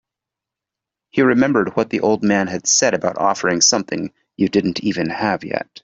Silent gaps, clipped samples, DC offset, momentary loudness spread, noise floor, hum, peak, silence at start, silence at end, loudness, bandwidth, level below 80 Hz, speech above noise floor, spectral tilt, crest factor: none; under 0.1%; under 0.1%; 9 LU; -85 dBFS; none; -2 dBFS; 1.15 s; 0.2 s; -17 LUFS; 8 kHz; -58 dBFS; 68 dB; -3 dB/octave; 16 dB